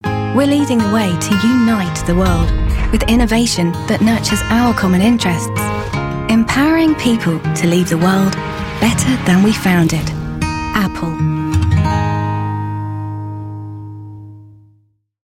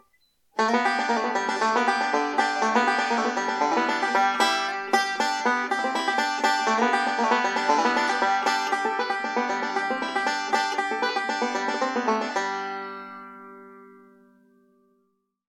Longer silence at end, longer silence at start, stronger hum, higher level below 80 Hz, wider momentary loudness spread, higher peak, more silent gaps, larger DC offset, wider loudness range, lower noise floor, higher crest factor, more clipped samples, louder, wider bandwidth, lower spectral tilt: second, 0.75 s vs 1.6 s; second, 0.05 s vs 0.55 s; neither; first, -26 dBFS vs -82 dBFS; first, 10 LU vs 5 LU; first, -2 dBFS vs -6 dBFS; neither; neither; about the same, 5 LU vs 6 LU; second, -56 dBFS vs -72 dBFS; second, 12 dB vs 18 dB; neither; first, -15 LUFS vs -24 LUFS; about the same, 16.5 kHz vs 15 kHz; first, -5.5 dB/octave vs -2 dB/octave